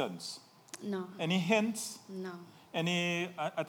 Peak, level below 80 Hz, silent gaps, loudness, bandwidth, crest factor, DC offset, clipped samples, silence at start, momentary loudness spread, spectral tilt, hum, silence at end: -14 dBFS; -84 dBFS; none; -35 LUFS; over 20 kHz; 20 dB; under 0.1%; under 0.1%; 0 s; 15 LU; -4.5 dB/octave; none; 0 s